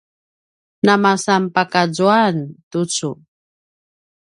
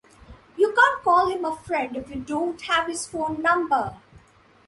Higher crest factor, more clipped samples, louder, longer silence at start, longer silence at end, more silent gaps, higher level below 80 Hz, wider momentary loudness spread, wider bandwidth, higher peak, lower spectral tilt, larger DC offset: about the same, 18 dB vs 20 dB; neither; first, -17 LUFS vs -23 LUFS; first, 0.85 s vs 0.3 s; first, 1.1 s vs 0.5 s; first, 2.63-2.71 s vs none; second, -64 dBFS vs -54 dBFS; about the same, 12 LU vs 12 LU; about the same, 11.5 kHz vs 11.5 kHz; first, 0 dBFS vs -4 dBFS; about the same, -4.5 dB/octave vs -3.5 dB/octave; neither